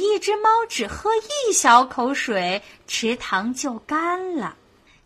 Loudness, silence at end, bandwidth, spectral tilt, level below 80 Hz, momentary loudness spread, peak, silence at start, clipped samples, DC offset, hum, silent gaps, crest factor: -21 LUFS; 0.5 s; 15 kHz; -2 dB/octave; -54 dBFS; 13 LU; 0 dBFS; 0 s; under 0.1%; under 0.1%; none; none; 20 dB